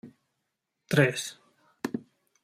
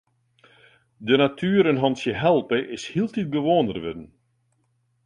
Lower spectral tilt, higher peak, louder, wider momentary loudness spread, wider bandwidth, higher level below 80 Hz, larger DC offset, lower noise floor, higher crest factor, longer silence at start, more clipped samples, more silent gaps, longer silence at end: second, -5 dB/octave vs -6.5 dB/octave; second, -8 dBFS vs -4 dBFS; second, -29 LUFS vs -22 LUFS; first, 15 LU vs 12 LU; first, 16 kHz vs 10.5 kHz; second, -70 dBFS vs -58 dBFS; neither; first, -82 dBFS vs -69 dBFS; about the same, 24 dB vs 20 dB; second, 0.05 s vs 1 s; neither; neither; second, 0.45 s vs 1 s